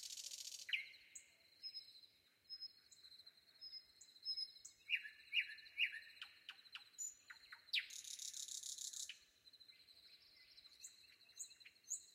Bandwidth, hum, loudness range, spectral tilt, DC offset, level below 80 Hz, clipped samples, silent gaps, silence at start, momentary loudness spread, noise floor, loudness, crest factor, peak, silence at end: 16 kHz; none; 9 LU; 4.5 dB/octave; under 0.1%; under -90 dBFS; under 0.1%; none; 0 s; 21 LU; -71 dBFS; -47 LUFS; 26 dB; -26 dBFS; 0 s